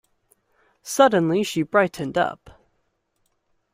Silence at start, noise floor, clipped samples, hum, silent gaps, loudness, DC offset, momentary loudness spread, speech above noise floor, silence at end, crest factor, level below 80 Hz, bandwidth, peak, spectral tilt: 0.85 s; -71 dBFS; under 0.1%; none; none; -21 LUFS; under 0.1%; 10 LU; 51 dB; 1.4 s; 20 dB; -62 dBFS; 16 kHz; -4 dBFS; -5 dB/octave